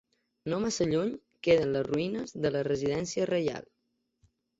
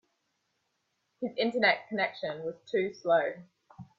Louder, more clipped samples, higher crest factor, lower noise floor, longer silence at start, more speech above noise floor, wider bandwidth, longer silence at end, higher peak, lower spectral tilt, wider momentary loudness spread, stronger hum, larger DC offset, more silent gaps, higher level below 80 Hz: about the same, -30 LUFS vs -30 LUFS; neither; about the same, 18 dB vs 22 dB; second, -71 dBFS vs -79 dBFS; second, 0.45 s vs 1.2 s; second, 42 dB vs 49 dB; about the same, 8 kHz vs 7.6 kHz; first, 1 s vs 0.15 s; about the same, -12 dBFS vs -12 dBFS; about the same, -5.5 dB/octave vs -5.5 dB/octave; second, 9 LU vs 12 LU; neither; neither; neither; first, -60 dBFS vs -78 dBFS